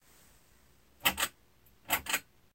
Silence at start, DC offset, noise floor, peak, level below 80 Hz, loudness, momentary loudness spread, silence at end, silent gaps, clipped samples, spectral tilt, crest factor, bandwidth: 1.05 s; under 0.1%; -65 dBFS; -12 dBFS; -62 dBFS; -32 LUFS; 5 LU; 0.35 s; none; under 0.1%; -0.5 dB/octave; 26 dB; 17 kHz